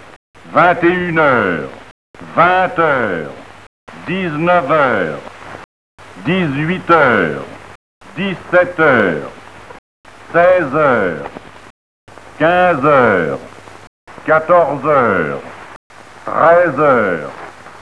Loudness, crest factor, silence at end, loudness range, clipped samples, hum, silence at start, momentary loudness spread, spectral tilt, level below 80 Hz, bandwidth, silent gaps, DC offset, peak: -13 LUFS; 16 dB; 0.05 s; 3 LU; under 0.1%; none; 0.45 s; 20 LU; -7 dB/octave; -50 dBFS; 11 kHz; 1.91-2.14 s, 3.67-3.87 s, 5.64-5.98 s, 7.75-8.01 s, 9.79-10.04 s, 11.70-12.07 s, 13.87-14.07 s, 15.76-15.90 s; 0.5%; 0 dBFS